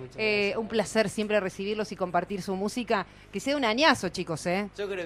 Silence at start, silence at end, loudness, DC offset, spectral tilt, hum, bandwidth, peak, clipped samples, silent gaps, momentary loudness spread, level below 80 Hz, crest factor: 0 s; 0 s; -28 LUFS; under 0.1%; -4 dB/octave; none; 15 kHz; -8 dBFS; under 0.1%; none; 9 LU; -58 dBFS; 20 dB